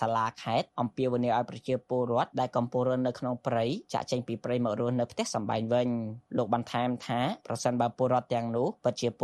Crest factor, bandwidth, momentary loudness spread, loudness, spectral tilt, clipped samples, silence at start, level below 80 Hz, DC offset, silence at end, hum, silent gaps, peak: 18 dB; 12.5 kHz; 5 LU; -30 LUFS; -6 dB/octave; under 0.1%; 0 s; -68 dBFS; under 0.1%; 0 s; none; none; -12 dBFS